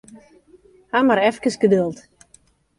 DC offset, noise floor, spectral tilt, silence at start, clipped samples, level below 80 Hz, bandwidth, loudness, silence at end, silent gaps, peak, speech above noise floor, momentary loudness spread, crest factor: under 0.1%; -56 dBFS; -5.5 dB/octave; 0.95 s; under 0.1%; -60 dBFS; 11.5 kHz; -19 LUFS; 0.8 s; none; -4 dBFS; 38 dB; 9 LU; 18 dB